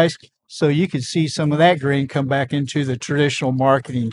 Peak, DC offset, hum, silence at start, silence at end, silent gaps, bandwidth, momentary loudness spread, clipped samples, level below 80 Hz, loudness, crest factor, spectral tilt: -2 dBFS; under 0.1%; none; 0 s; 0 s; none; 11 kHz; 7 LU; under 0.1%; -60 dBFS; -19 LUFS; 18 dB; -6 dB/octave